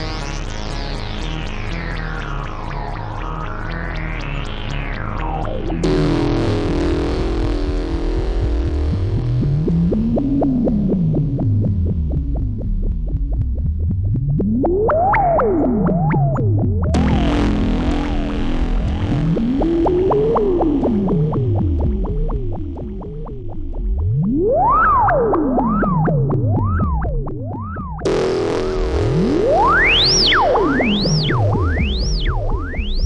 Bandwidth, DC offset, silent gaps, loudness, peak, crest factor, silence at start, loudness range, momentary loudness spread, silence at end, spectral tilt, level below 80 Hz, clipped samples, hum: 9.8 kHz; under 0.1%; none; -18 LUFS; -4 dBFS; 12 dB; 0 s; 9 LU; 12 LU; 0 s; -6.5 dB/octave; -24 dBFS; under 0.1%; none